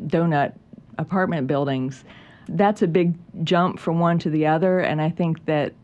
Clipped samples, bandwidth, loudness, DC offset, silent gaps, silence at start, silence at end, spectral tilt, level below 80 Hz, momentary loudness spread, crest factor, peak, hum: under 0.1%; 8.2 kHz; -22 LUFS; under 0.1%; none; 0 s; 0.1 s; -8 dB/octave; -60 dBFS; 11 LU; 16 dB; -6 dBFS; none